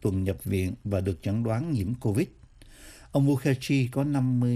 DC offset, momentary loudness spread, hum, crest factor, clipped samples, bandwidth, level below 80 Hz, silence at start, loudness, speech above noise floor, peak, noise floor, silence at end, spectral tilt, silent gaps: under 0.1%; 5 LU; none; 16 dB; under 0.1%; 15 kHz; -52 dBFS; 0 s; -28 LUFS; 24 dB; -12 dBFS; -50 dBFS; 0 s; -7.5 dB/octave; none